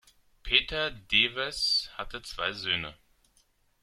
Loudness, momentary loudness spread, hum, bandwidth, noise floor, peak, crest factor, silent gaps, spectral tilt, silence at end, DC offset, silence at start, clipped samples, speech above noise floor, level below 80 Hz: -27 LUFS; 14 LU; none; 15.5 kHz; -68 dBFS; -6 dBFS; 26 dB; none; -2 dB/octave; 0.9 s; under 0.1%; 0.45 s; under 0.1%; 38 dB; -50 dBFS